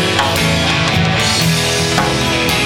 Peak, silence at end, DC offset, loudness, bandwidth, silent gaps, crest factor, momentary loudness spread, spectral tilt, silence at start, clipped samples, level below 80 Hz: 0 dBFS; 0 s; under 0.1%; -13 LUFS; over 20 kHz; none; 14 dB; 1 LU; -3.5 dB/octave; 0 s; under 0.1%; -32 dBFS